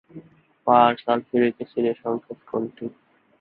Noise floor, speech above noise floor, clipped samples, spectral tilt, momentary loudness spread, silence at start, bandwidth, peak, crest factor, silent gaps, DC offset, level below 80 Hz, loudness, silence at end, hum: -47 dBFS; 25 dB; under 0.1%; -10.5 dB/octave; 15 LU; 0.15 s; 4.7 kHz; -2 dBFS; 22 dB; none; under 0.1%; -68 dBFS; -23 LUFS; 0.5 s; none